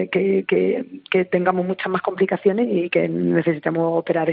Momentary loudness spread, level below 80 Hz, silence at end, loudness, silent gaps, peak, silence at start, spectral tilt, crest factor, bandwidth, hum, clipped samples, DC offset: 4 LU; -66 dBFS; 0 s; -20 LUFS; none; -4 dBFS; 0 s; -5.5 dB/octave; 16 dB; 4.7 kHz; none; under 0.1%; under 0.1%